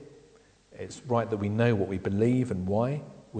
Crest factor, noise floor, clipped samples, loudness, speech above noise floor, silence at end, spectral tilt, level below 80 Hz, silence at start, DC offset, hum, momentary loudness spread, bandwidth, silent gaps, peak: 18 dB; -59 dBFS; under 0.1%; -28 LUFS; 31 dB; 0 s; -8 dB/octave; -62 dBFS; 0 s; under 0.1%; none; 14 LU; 9.2 kHz; none; -12 dBFS